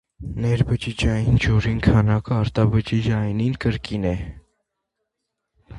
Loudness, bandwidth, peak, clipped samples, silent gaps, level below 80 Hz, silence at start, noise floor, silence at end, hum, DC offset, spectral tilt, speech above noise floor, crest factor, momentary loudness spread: -21 LUFS; 10.5 kHz; -2 dBFS; under 0.1%; none; -34 dBFS; 0.2 s; -80 dBFS; 0 s; none; under 0.1%; -7.5 dB/octave; 60 dB; 18 dB; 7 LU